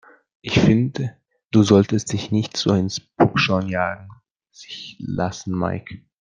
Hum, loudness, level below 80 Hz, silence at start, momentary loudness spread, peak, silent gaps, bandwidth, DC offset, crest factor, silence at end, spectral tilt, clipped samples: none; -20 LUFS; -52 dBFS; 0.45 s; 18 LU; -2 dBFS; 4.31-4.35 s; 9.6 kHz; under 0.1%; 20 dB; 0.25 s; -6 dB/octave; under 0.1%